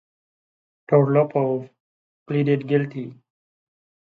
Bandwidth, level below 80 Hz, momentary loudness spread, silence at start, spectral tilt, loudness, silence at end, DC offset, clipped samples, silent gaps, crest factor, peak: 4.5 kHz; -72 dBFS; 13 LU; 0.9 s; -10.5 dB/octave; -21 LUFS; 0.9 s; under 0.1%; under 0.1%; 1.80-2.26 s; 22 dB; -2 dBFS